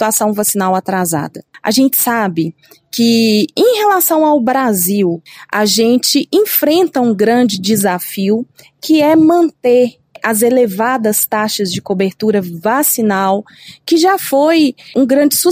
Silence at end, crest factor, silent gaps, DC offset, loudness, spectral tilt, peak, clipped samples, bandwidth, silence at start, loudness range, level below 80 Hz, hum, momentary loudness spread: 0 s; 12 dB; none; under 0.1%; -12 LUFS; -4 dB/octave; 0 dBFS; under 0.1%; 16 kHz; 0 s; 2 LU; -60 dBFS; none; 7 LU